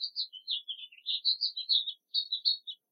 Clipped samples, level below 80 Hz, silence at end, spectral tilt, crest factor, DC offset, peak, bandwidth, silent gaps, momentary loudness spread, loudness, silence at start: under 0.1%; under -90 dBFS; 0.15 s; 4.5 dB/octave; 20 dB; under 0.1%; -14 dBFS; 6 kHz; none; 8 LU; -30 LUFS; 0 s